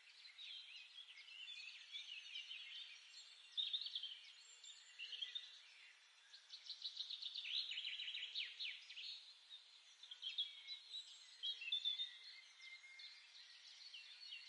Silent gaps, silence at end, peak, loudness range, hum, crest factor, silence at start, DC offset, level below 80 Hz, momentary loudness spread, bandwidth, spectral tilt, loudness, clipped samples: none; 0 s; -32 dBFS; 5 LU; none; 20 dB; 0 s; under 0.1%; under -90 dBFS; 16 LU; 11 kHz; 6.5 dB/octave; -49 LUFS; under 0.1%